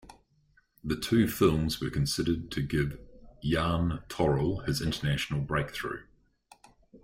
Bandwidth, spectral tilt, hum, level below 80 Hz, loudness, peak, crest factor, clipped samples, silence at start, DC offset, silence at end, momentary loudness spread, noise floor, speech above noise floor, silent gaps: 16 kHz; -5.5 dB/octave; none; -46 dBFS; -30 LUFS; -10 dBFS; 20 dB; under 0.1%; 0.05 s; under 0.1%; 0.05 s; 10 LU; -67 dBFS; 38 dB; none